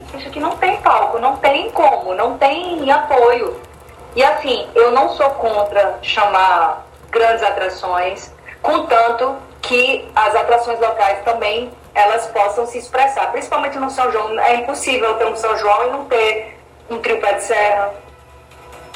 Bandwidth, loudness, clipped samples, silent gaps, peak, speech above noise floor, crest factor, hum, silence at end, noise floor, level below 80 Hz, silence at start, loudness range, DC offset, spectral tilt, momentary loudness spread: 15.5 kHz; -16 LUFS; under 0.1%; none; 0 dBFS; 27 dB; 16 dB; none; 0 s; -42 dBFS; -48 dBFS; 0 s; 2 LU; under 0.1%; -3 dB/octave; 9 LU